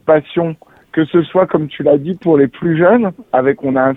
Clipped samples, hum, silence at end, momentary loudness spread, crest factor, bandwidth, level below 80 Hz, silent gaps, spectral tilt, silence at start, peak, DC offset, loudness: under 0.1%; none; 0 s; 8 LU; 14 dB; 4 kHz; -52 dBFS; none; -10 dB/octave; 0.05 s; 0 dBFS; under 0.1%; -14 LUFS